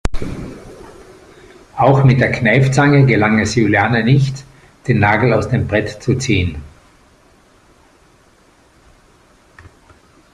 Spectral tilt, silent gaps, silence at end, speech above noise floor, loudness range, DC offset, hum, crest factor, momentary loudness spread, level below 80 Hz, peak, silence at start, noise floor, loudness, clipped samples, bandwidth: -6.5 dB/octave; none; 3.65 s; 38 dB; 10 LU; under 0.1%; none; 16 dB; 18 LU; -36 dBFS; 0 dBFS; 0.05 s; -50 dBFS; -14 LUFS; under 0.1%; 10 kHz